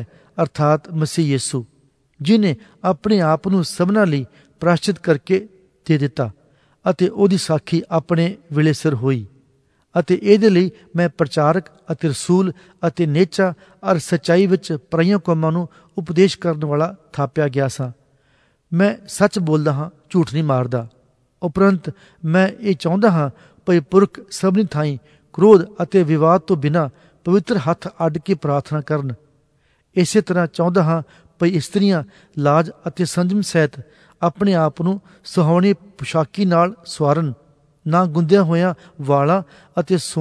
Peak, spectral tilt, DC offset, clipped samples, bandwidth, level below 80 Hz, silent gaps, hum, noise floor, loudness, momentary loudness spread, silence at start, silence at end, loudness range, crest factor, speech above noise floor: 0 dBFS; -6.5 dB/octave; under 0.1%; under 0.1%; 11 kHz; -58 dBFS; none; none; -61 dBFS; -18 LUFS; 10 LU; 0 s; 0 s; 4 LU; 18 dB; 44 dB